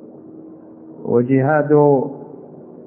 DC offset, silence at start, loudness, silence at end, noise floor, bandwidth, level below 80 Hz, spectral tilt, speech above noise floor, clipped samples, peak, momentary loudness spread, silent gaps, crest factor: under 0.1%; 0 s; -16 LUFS; 0 s; -39 dBFS; 3 kHz; -66 dBFS; -14 dB/octave; 25 dB; under 0.1%; -2 dBFS; 23 LU; none; 16 dB